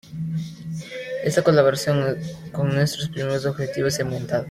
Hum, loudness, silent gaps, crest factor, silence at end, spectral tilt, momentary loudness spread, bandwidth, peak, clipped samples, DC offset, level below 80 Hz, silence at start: none; -23 LUFS; none; 18 dB; 0 s; -5.5 dB/octave; 14 LU; 16 kHz; -4 dBFS; under 0.1%; under 0.1%; -54 dBFS; 0.05 s